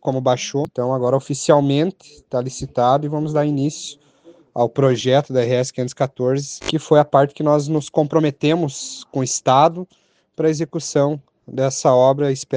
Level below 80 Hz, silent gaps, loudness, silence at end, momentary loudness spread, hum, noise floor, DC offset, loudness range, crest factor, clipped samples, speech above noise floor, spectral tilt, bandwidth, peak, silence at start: -56 dBFS; none; -18 LUFS; 0 s; 10 LU; none; -49 dBFS; under 0.1%; 2 LU; 18 dB; under 0.1%; 31 dB; -5.5 dB/octave; 10 kHz; 0 dBFS; 0.05 s